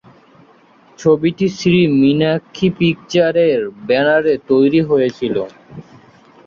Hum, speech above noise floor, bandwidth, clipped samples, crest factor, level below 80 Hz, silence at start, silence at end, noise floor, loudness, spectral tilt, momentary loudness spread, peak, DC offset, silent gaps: none; 34 dB; 7.2 kHz; under 0.1%; 14 dB; -52 dBFS; 1 s; 0.65 s; -48 dBFS; -15 LUFS; -6.5 dB/octave; 7 LU; -2 dBFS; under 0.1%; none